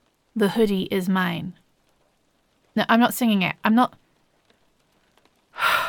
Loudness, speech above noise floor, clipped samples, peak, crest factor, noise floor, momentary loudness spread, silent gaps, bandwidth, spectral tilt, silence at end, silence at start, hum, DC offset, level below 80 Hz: -22 LUFS; 45 dB; under 0.1%; -6 dBFS; 18 dB; -66 dBFS; 13 LU; none; 17.5 kHz; -5 dB/octave; 0 s; 0.35 s; none; under 0.1%; -60 dBFS